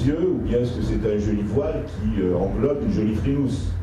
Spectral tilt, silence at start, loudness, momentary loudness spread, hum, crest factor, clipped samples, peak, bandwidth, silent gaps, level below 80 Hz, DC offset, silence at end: -8.5 dB/octave; 0 s; -23 LUFS; 3 LU; none; 14 dB; under 0.1%; -8 dBFS; 11 kHz; none; -32 dBFS; under 0.1%; 0 s